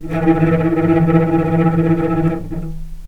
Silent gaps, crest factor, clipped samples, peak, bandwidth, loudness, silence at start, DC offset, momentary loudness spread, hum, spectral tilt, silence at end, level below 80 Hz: none; 14 dB; under 0.1%; 0 dBFS; 4.2 kHz; -15 LUFS; 0 s; under 0.1%; 12 LU; none; -10 dB/octave; 0 s; -30 dBFS